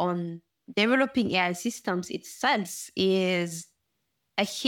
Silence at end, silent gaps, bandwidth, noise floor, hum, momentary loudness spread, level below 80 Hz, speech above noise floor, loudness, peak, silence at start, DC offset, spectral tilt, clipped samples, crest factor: 0 s; none; 18 kHz; -79 dBFS; none; 11 LU; -70 dBFS; 51 dB; -27 LUFS; -8 dBFS; 0 s; under 0.1%; -4 dB/octave; under 0.1%; 20 dB